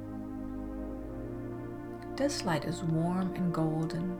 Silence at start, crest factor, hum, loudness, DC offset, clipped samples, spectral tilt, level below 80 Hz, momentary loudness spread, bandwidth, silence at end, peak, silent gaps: 0 s; 16 dB; none; -34 LUFS; under 0.1%; under 0.1%; -6.5 dB/octave; -50 dBFS; 10 LU; 15.5 kHz; 0 s; -18 dBFS; none